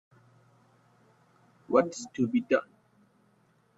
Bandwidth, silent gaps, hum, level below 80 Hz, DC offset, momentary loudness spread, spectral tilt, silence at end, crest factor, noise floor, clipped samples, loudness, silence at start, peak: 8 kHz; none; none; -74 dBFS; under 0.1%; 5 LU; -5.5 dB/octave; 1.15 s; 24 dB; -67 dBFS; under 0.1%; -29 LUFS; 1.7 s; -8 dBFS